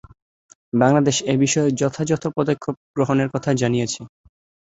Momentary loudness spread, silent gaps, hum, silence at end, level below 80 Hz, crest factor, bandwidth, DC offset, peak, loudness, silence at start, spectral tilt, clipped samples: 9 LU; 2.77-2.94 s; none; 0.65 s; -56 dBFS; 20 dB; 8.2 kHz; under 0.1%; -2 dBFS; -20 LUFS; 0.75 s; -5.5 dB/octave; under 0.1%